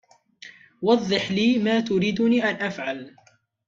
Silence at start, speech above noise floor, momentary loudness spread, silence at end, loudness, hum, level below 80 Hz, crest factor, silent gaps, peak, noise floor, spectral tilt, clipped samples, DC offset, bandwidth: 0.45 s; 26 dB; 9 LU; 0.6 s; -22 LUFS; none; -62 dBFS; 18 dB; none; -6 dBFS; -48 dBFS; -5.5 dB/octave; under 0.1%; under 0.1%; 7.6 kHz